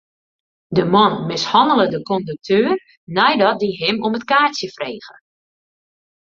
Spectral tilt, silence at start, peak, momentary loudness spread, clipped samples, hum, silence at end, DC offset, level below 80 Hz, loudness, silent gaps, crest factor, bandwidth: -5 dB/octave; 0.7 s; -2 dBFS; 11 LU; under 0.1%; none; 1.2 s; under 0.1%; -58 dBFS; -17 LUFS; 2.97-3.07 s; 18 dB; 7.6 kHz